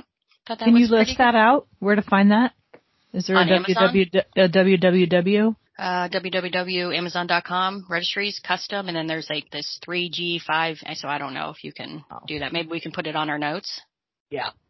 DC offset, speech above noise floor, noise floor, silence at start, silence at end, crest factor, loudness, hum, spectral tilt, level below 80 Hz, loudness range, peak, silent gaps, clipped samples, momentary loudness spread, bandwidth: under 0.1%; 34 dB; -55 dBFS; 0.45 s; 0.2 s; 20 dB; -21 LUFS; none; -6 dB/octave; -56 dBFS; 8 LU; -2 dBFS; 14.20-14.26 s; under 0.1%; 14 LU; 6.2 kHz